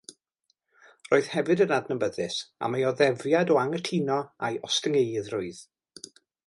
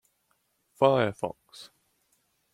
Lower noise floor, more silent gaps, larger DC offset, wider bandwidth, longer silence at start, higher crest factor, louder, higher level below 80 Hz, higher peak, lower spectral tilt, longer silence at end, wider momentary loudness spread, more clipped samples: about the same, -75 dBFS vs -73 dBFS; neither; neither; second, 11.5 kHz vs 13.5 kHz; first, 1.1 s vs 0.8 s; about the same, 20 dB vs 24 dB; about the same, -26 LUFS vs -26 LUFS; about the same, -70 dBFS vs -70 dBFS; about the same, -8 dBFS vs -6 dBFS; second, -4.5 dB/octave vs -6.5 dB/octave; about the same, 0.85 s vs 0.85 s; second, 15 LU vs 25 LU; neither